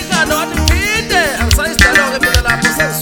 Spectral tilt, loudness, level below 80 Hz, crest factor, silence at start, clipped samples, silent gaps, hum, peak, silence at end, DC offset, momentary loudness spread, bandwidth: -3 dB/octave; -12 LUFS; -20 dBFS; 12 dB; 0 s; 0.2%; none; none; 0 dBFS; 0 s; under 0.1%; 5 LU; over 20 kHz